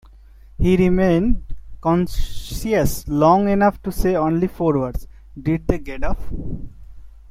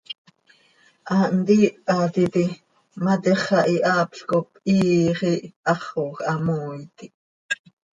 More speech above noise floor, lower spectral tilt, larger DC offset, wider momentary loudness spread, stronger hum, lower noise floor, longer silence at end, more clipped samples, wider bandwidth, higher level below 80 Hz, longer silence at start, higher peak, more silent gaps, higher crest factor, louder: second, 26 dB vs 38 dB; about the same, -7 dB/octave vs -6.5 dB/octave; neither; first, 15 LU vs 11 LU; neither; second, -44 dBFS vs -59 dBFS; second, 0.2 s vs 0.4 s; neither; first, 16 kHz vs 9 kHz; first, -30 dBFS vs -62 dBFS; first, 0.6 s vs 0.1 s; first, -2 dBFS vs -6 dBFS; second, none vs 0.18-0.25 s, 5.56-5.63 s, 7.14-7.49 s; about the same, 16 dB vs 18 dB; about the same, -20 LUFS vs -22 LUFS